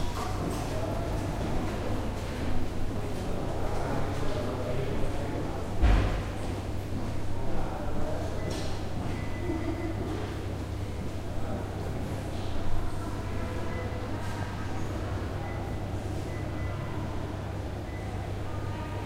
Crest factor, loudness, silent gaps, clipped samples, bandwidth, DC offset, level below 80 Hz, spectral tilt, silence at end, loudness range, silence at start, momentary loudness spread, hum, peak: 18 dB; -34 LUFS; none; under 0.1%; 14.5 kHz; under 0.1%; -36 dBFS; -6.5 dB/octave; 0 s; 4 LU; 0 s; 3 LU; none; -12 dBFS